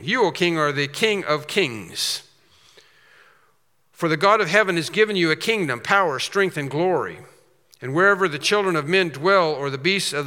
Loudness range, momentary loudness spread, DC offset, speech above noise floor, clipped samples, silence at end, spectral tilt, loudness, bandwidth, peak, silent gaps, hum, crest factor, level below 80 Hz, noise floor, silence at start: 5 LU; 7 LU; under 0.1%; 45 dB; under 0.1%; 0 s; -4 dB/octave; -20 LUFS; 17 kHz; 0 dBFS; none; none; 20 dB; -76 dBFS; -65 dBFS; 0 s